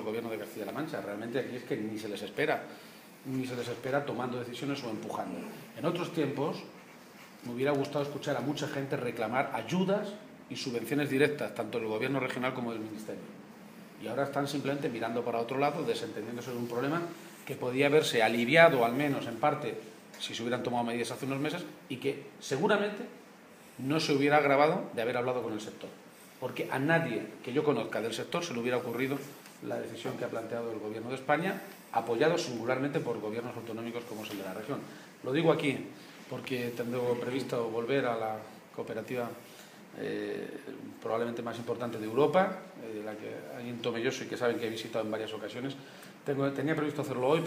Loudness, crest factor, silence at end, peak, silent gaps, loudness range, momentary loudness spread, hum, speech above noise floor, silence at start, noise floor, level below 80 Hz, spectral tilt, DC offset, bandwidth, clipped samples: -33 LUFS; 26 dB; 0 s; -6 dBFS; none; 8 LU; 15 LU; none; 22 dB; 0 s; -54 dBFS; -78 dBFS; -5.5 dB/octave; under 0.1%; 15.5 kHz; under 0.1%